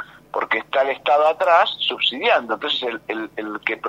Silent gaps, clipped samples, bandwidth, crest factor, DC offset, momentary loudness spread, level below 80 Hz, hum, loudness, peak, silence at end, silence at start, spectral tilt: none; under 0.1%; 15 kHz; 18 dB; under 0.1%; 11 LU; -66 dBFS; none; -20 LUFS; -2 dBFS; 0 s; 0 s; -3.5 dB/octave